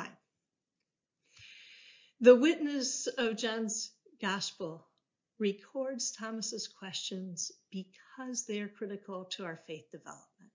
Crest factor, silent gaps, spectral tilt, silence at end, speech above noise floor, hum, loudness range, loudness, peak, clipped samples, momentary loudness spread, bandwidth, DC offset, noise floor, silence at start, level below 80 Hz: 26 dB; none; -3 dB/octave; 0.35 s; 56 dB; none; 10 LU; -33 LUFS; -10 dBFS; under 0.1%; 23 LU; 7.6 kHz; under 0.1%; -89 dBFS; 0 s; -86 dBFS